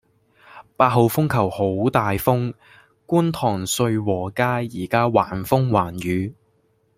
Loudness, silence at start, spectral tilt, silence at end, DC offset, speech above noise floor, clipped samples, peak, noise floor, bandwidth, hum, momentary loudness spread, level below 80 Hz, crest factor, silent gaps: -21 LUFS; 0.55 s; -6 dB/octave; 0.65 s; under 0.1%; 43 dB; under 0.1%; -2 dBFS; -63 dBFS; 16 kHz; none; 6 LU; -52 dBFS; 20 dB; none